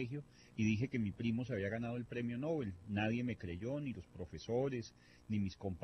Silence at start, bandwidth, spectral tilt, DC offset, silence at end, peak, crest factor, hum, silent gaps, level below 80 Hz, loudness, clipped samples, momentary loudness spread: 0 s; 8.4 kHz; -7 dB/octave; under 0.1%; 0 s; -22 dBFS; 18 dB; none; none; -64 dBFS; -41 LUFS; under 0.1%; 11 LU